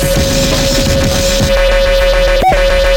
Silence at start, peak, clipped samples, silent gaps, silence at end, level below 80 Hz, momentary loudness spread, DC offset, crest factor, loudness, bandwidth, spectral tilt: 0 s; 0 dBFS; under 0.1%; none; 0 s; -16 dBFS; 1 LU; under 0.1%; 10 dB; -11 LUFS; 17 kHz; -4 dB/octave